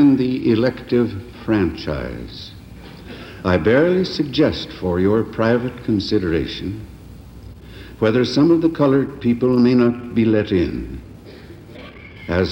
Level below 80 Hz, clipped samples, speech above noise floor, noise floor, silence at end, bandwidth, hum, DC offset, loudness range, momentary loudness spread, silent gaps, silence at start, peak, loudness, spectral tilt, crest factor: -40 dBFS; under 0.1%; 21 dB; -39 dBFS; 0 s; 16.5 kHz; none; under 0.1%; 5 LU; 23 LU; none; 0 s; -4 dBFS; -18 LUFS; -7.5 dB/octave; 16 dB